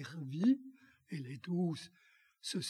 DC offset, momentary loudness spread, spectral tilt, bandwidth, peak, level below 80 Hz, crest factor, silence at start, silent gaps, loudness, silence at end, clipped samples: under 0.1%; 16 LU; -5.5 dB/octave; 13 kHz; -22 dBFS; -88 dBFS; 18 dB; 0 s; none; -38 LUFS; 0 s; under 0.1%